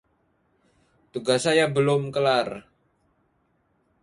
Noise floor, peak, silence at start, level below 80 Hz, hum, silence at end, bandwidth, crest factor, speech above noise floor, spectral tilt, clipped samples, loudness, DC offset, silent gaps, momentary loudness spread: -69 dBFS; -8 dBFS; 1.15 s; -64 dBFS; none; 1.4 s; 11.5 kHz; 18 dB; 46 dB; -4.5 dB/octave; under 0.1%; -23 LUFS; under 0.1%; none; 14 LU